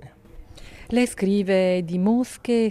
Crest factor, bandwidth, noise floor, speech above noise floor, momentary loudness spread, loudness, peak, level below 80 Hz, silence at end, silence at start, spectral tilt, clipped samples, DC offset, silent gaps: 14 dB; 13.5 kHz; -44 dBFS; 23 dB; 4 LU; -22 LUFS; -10 dBFS; -48 dBFS; 0 s; 0 s; -6.5 dB/octave; under 0.1%; under 0.1%; none